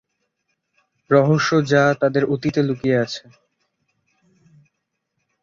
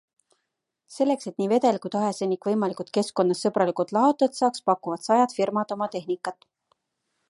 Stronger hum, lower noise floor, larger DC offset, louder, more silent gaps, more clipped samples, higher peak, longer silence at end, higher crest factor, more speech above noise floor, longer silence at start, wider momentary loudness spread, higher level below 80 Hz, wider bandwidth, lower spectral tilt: neither; second, -76 dBFS vs -81 dBFS; neither; first, -18 LUFS vs -25 LUFS; neither; neither; first, -2 dBFS vs -8 dBFS; first, 2.25 s vs 0.95 s; about the same, 18 dB vs 18 dB; about the same, 58 dB vs 57 dB; first, 1.1 s vs 0.9 s; about the same, 5 LU vs 7 LU; first, -58 dBFS vs -76 dBFS; second, 7.6 kHz vs 11.5 kHz; about the same, -6.5 dB/octave vs -5.5 dB/octave